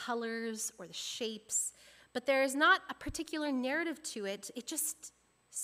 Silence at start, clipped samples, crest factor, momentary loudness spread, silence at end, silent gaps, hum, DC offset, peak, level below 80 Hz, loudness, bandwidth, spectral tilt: 0 s; under 0.1%; 20 dB; 14 LU; 0 s; none; 60 Hz at -80 dBFS; under 0.1%; -16 dBFS; -64 dBFS; -35 LUFS; 16 kHz; -1.5 dB/octave